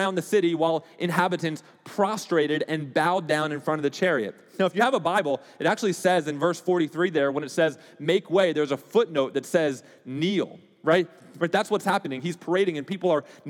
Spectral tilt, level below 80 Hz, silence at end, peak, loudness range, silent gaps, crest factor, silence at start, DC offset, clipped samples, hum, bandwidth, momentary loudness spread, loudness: -5 dB/octave; -90 dBFS; 0 s; -8 dBFS; 2 LU; none; 18 dB; 0 s; under 0.1%; under 0.1%; none; 18 kHz; 7 LU; -25 LUFS